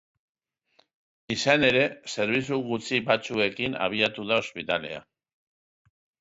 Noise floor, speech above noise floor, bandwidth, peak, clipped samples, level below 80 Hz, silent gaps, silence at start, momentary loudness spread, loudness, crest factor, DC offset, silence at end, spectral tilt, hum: -67 dBFS; 41 dB; 8 kHz; -6 dBFS; under 0.1%; -62 dBFS; none; 1.3 s; 9 LU; -25 LUFS; 22 dB; under 0.1%; 1.2 s; -4 dB/octave; none